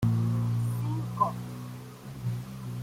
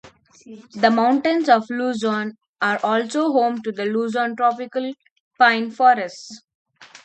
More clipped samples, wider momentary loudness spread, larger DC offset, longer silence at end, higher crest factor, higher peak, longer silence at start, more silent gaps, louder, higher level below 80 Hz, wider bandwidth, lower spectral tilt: neither; about the same, 14 LU vs 12 LU; neither; about the same, 0 s vs 0.05 s; about the same, 18 dB vs 20 dB; second, -14 dBFS vs 0 dBFS; about the same, 0 s vs 0.05 s; second, none vs 2.48-2.54 s, 5.11-5.31 s, 6.55-6.65 s; second, -31 LUFS vs -19 LUFS; first, -56 dBFS vs -72 dBFS; first, 16 kHz vs 8.8 kHz; first, -8 dB/octave vs -4.5 dB/octave